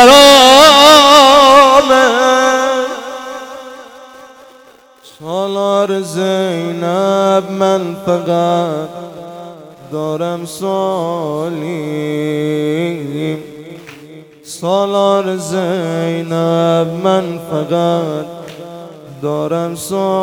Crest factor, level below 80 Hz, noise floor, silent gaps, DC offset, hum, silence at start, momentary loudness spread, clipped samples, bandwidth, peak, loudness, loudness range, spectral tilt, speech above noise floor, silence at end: 12 dB; -48 dBFS; -43 dBFS; none; under 0.1%; none; 0 s; 24 LU; 0.6%; 19.5 kHz; 0 dBFS; -11 LUFS; 12 LU; -3.5 dB/octave; 28 dB; 0 s